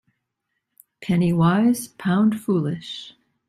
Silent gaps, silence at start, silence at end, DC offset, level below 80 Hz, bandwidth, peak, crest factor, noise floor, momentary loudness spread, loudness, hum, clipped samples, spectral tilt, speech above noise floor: none; 1 s; 0.4 s; under 0.1%; -58 dBFS; 15 kHz; -6 dBFS; 16 dB; -78 dBFS; 16 LU; -21 LUFS; none; under 0.1%; -6.5 dB/octave; 58 dB